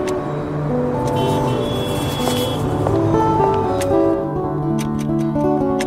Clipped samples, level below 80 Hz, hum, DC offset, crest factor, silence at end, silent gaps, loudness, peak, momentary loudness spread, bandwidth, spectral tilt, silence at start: under 0.1%; -38 dBFS; none; under 0.1%; 16 dB; 0 s; none; -19 LUFS; -2 dBFS; 5 LU; 16 kHz; -6.5 dB/octave; 0 s